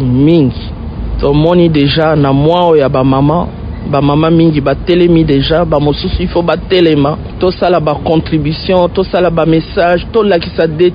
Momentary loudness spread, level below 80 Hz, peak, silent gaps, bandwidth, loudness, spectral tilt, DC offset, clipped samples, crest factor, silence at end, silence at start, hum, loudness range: 7 LU; -24 dBFS; 0 dBFS; none; 5.2 kHz; -10 LUFS; -9.5 dB/octave; under 0.1%; 0.2%; 10 dB; 0 s; 0 s; none; 2 LU